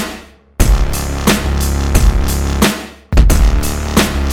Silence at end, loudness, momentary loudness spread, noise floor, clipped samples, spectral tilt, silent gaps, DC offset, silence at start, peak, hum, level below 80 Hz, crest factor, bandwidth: 0 s; -15 LUFS; 6 LU; -33 dBFS; under 0.1%; -4.5 dB/octave; none; under 0.1%; 0 s; 0 dBFS; none; -14 dBFS; 12 dB; 18 kHz